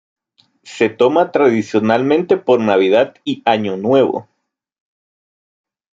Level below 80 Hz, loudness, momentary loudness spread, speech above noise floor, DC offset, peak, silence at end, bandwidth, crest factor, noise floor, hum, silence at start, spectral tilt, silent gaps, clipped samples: -64 dBFS; -15 LUFS; 6 LU; 58 dB; under 0.1%; 0 dBFS; 1.75 s; 7.8 kHz; 16 dB; -72 dBFS; none; 0.65 s; -6.5 dB/octave; none; under 0.1%